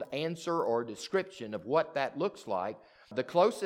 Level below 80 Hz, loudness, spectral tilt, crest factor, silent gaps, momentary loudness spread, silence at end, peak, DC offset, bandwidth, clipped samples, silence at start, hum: -78 dBFS; -33 LUFS; -5 dB/octave; 20 dB; none; 11 LU; 0 s; -12 dBFS; under 0.1%; 15.5 kHz; under 0.1%; 0 s; none